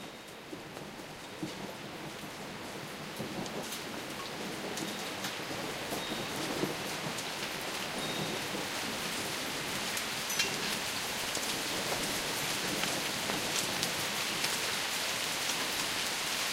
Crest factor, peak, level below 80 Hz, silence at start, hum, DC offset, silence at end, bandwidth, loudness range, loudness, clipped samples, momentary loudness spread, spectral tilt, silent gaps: 28 dB; -8 dBFS; -64 dBFS; 0 s; none; under 0.1%; 0 s; 16 kHz; 9 LU; -34 LUFS; under 0.1%; 11 LU; -2 dB/octave; none